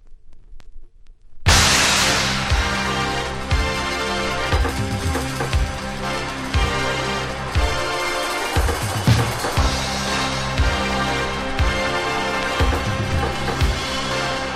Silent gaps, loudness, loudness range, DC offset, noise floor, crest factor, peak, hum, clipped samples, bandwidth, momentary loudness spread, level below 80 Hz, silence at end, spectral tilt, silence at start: none; -20 LUFS; 4 LU; under 0.1%; -41 dBFS; 20 dB; 0 dBFS; none; under 0.1%; 16 kHz; 7 LU; -28 dBFS; 0 s; -3.5 dB/octave; 0.05 s